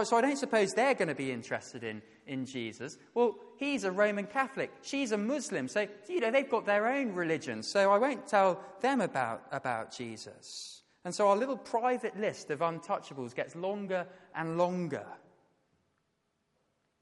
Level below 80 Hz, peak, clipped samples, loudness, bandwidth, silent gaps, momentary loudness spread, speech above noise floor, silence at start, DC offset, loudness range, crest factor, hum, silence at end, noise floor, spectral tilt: -80 dBFS; -14 dBFS; under 0.1%; -32 LUFS; 11.5 kHz; none; 14 LU; 47 dB; 0 s; under 0.1%; 6 LU; 20 dB; none; 1.85 s; -79 dBFS; -4.5 dB/octave